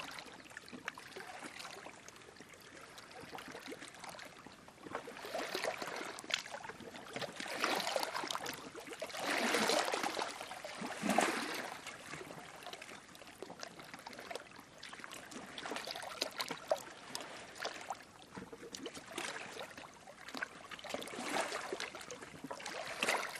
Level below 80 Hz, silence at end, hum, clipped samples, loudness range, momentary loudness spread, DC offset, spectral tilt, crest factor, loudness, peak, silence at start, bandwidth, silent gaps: -78 dBFS; 0 s; none; under 0.1%; 13 LU; 16 LU; under 0.1%; -2 dB/octave; 28 dB; -41 LUFS; -16 dBFS; 0 s; 15 kHz; none